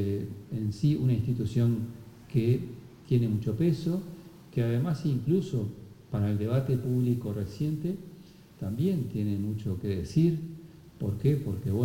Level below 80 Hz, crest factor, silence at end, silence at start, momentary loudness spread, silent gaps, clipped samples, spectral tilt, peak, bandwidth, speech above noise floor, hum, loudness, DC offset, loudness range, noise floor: -56 dBFS; 16 dB; 0 s; 0 s; 12 LU; none; under 0.1%; -9 dB/octave; -14 dBFS; 17 kHz; 23 dB; none; -30 LUFS; under 0.1%; 2 LU; -51 dBFS